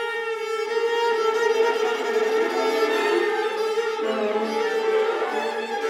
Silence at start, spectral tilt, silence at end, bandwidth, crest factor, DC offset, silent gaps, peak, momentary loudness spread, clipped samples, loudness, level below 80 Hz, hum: 0 s; -2.5 dB/octave; 0 s; 14.5 kHz; 14 dB; under 0.1%; none; -8 dBFS; 5 LU; under 0.1%; -23 LUFS; -76 dBFS; none